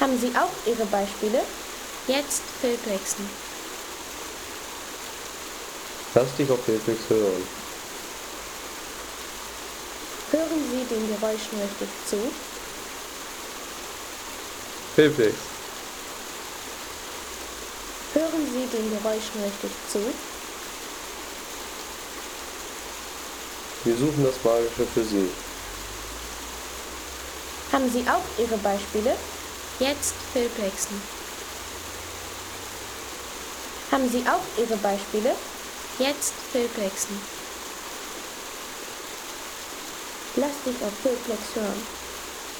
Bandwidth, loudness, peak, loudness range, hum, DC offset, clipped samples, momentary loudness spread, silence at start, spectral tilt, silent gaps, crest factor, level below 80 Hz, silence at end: over 20 kHz; -28 LUFS; -6 dBFS; 6 LU; none; under 0.1%; under 0.1%; 11 LU; 0 s; -3.5 dB/octave; none; 22 dB; -52 dBFS; 0 s